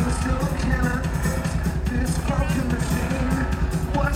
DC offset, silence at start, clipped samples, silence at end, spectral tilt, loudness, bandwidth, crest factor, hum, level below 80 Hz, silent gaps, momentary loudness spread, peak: under 0.1%; 0 s; under 0.1%; 0 s; -6 dB/octave; -24 LUFS; 16 kHz; 14 dB; none; -26 dBFS; none; 2 LU; -10 dBFS